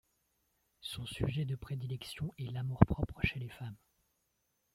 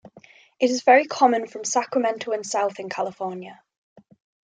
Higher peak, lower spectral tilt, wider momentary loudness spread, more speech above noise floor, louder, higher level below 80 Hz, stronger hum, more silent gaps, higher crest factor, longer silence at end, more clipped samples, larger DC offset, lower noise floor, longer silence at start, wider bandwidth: second, -8 dBFS vs -4 dBFS; first, -7 dB/octave vs -3 dB/octave; about the same, 15 LU vs 15 LU; first, 45 dB vs 30 dB; second, -36 LUFS vs -22 LUFS; first, -50 dBFS vs -78 dBFS; neither; neither; first, 30 dB vs 20 dB; about the same, 1 s vs 0.95 s; neither; neither; first, -80 dBFS vs -52 dBFS; first, 0.85 s vs 0.15 s; first, 15.5 kHz vs 9.4 kHz